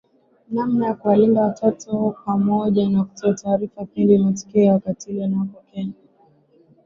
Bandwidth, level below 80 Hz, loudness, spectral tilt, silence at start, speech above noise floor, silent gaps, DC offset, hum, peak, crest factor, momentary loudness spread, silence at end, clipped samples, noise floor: 7.4 kHz; -60 dBFS; -20 LUFS; -8 dB/octave; 0.5 s; 37 dB; none; under 0.1%; none; -4 dBFS; 16 dB; 12 LU; 0.95 s; under 0.1%; -56 dBFS